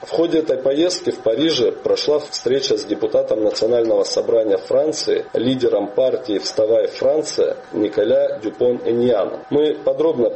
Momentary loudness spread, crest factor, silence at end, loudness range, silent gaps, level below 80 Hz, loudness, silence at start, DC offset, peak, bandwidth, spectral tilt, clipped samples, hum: 4 LU; 12 dB; 0 s; 1 LU; none; -58 dBFS; -18 LUFS; 0 s; under 0.1%; -6 dBFS; 8.6 kHz; -4.5 dB/octave; under 0.1%; none